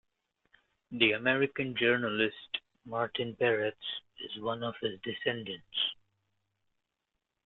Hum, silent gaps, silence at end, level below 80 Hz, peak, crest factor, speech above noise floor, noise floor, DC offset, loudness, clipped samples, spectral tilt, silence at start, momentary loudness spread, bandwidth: none; none; 1.5 s; -74 dBFS; -8 dBFS; 26 dB; 53 dB; -85 dBFS; under 0.1%; -32 LUFS; under 0.1%; -2 dB/octave; 0.9 s; 12 LU; 4.3 kHz